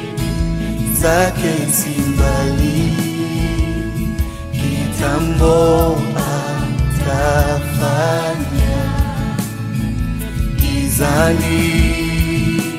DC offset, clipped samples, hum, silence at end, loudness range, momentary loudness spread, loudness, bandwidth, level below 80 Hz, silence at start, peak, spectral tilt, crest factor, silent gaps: under 0.1%; under 0.1%; none; 0 s; 3 LU; 8 LU; -17 LUFS; 16 kHz; -22 dBFS; 0 s; -2 dBFS; -5.5 dB/octave; 14 dB; none